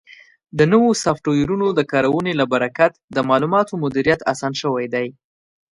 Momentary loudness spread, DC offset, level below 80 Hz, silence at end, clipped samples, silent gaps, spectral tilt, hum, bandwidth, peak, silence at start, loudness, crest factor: 7 LU; under 0.1%; -52 dBFS; 0.65 s; under 0.1%; 3.04-3.08 s; -5.5 dB/octave; none; 11.5 kHz; 0 dBFS; 0.55 s; -18 LUFS; 18 dB